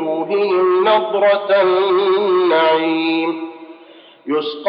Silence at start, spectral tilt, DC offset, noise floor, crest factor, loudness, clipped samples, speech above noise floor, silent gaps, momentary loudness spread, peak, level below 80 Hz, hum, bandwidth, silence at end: 0 s; -9 dB/octave; under 0.1%; -43 dBFS; 12 dB; -15 LUFS; under 0.1%; 28 dB; none; 9 LU; -4 dBFS; -88 dBFS; none; 5.4 kHz; 0 s